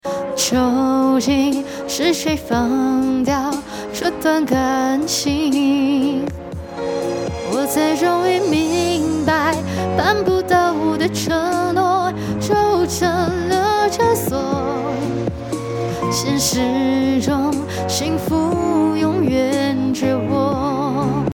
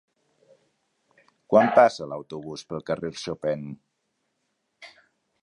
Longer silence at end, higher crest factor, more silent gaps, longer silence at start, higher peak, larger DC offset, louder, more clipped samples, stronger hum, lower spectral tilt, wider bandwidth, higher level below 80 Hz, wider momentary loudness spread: second, 0 s vs 0.55 s; second, 16 dB vs 24 dB; neither; second, 0.05 s vs 1.5 s; about the same, -2 dBFS vs -2 dBFS; neither; first, -18 LUFS vs -24 LUFS; neither; neither; about the same, -4.5 dB/octave vs -5.5 dB/octave; first, 18 kHz vs 10.5 kHz; first, -42 dBFS vs -66 dBFS; second, 7 LU vs 18 LU